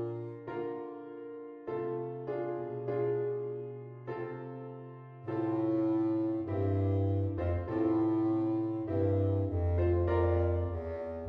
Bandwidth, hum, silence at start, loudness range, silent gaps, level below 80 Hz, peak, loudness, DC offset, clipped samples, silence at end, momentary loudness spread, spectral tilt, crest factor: 4.5 kHz; none; 0 s; 7 LU; none; -50 dBFS; -18 dBFS; -33 LUFS; under 0.1%; under 0.1%; 0 s; 14 LU; -11.5 dB/octave; 14 dB